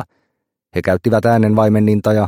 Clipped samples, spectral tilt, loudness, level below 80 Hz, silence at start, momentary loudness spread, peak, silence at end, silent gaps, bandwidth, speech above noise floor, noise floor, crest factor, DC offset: under 0.1%; -8.5 dB/octave; -14 LUFS; -48 dBFS; 0 s; 11 LU; -2 dBFS; 0 s; none; 16 kHz; 59 dB; -72 dBFS; 14 dB; under 0.1%